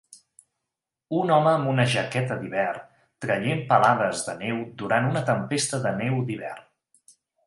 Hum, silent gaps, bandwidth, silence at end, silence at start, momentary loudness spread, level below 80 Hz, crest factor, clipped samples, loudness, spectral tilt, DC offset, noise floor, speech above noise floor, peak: none; none; 11.5 kHz; 0.85 s; 1.1 s; 11 LU; -66 dBFS; 20 dB; under 0.1%; -24 LUFS; -5 dB/octave; under 0.1%; -86 dBFS; 62 dB; -6 dBFS